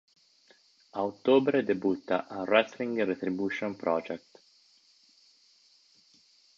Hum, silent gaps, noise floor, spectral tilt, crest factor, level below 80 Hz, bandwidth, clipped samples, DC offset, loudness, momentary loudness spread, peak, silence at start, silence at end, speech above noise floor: none; none; -63 dBFS; -6.5 dB/octave; 22 dB; -74 dBFS; 7.4 kHz; under 0.1%; under 0.1%; -29 LUFS; 10 LU; -10 dBFS; 0.95 s; 2.4 s; 35 dB